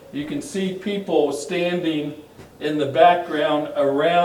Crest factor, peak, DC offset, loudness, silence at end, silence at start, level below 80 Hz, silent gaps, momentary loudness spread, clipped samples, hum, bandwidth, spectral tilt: 18 dB; -2 dBFS; under 0.1%; -21 LUFS; 0 s; 0.05 s; -62 dBFS; none; 13 LU; under 0.1%; none; 17 kHz; -5 dB/octave